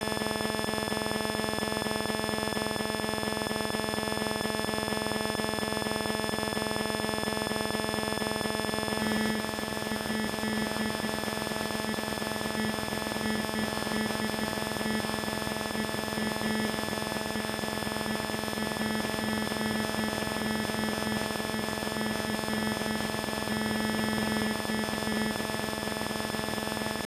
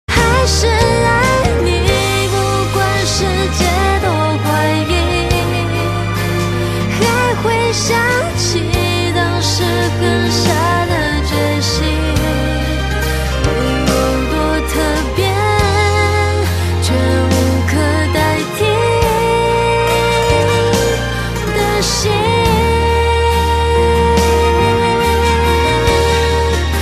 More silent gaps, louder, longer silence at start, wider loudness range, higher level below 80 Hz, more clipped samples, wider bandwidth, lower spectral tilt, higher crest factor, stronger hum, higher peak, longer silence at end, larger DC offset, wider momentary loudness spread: neither; second, -31 LUFS vs -14 LUFS; about the same, 0 s vs 0.1 s; about the same, 1 LU vs 3 LU; second, -54 dBFS vs -22 dBFS; neither; first, 15.5 kHz vs 14 kHz; about the same, -3.5 dB/octave vs -4.5 dB/octave; about the same, 16 dB vs 12 dB; neither; second, -14 dBFS vs 0 dBFS; about the same, 0.05 s vs 0 s; neither; about the same, 2 LU vs 4 LU